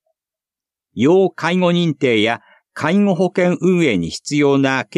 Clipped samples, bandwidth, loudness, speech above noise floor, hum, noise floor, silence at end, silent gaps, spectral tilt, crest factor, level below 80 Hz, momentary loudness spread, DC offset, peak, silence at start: under 0.1%; 11 kHz; -16 LUFS; 73 dB; none; -89 dBFS; 0.15 s; none; -6 dB/octave; 14 dB; -56 dBFS; 7 LU; under 0.1%; -2 dBFS; 0.95 s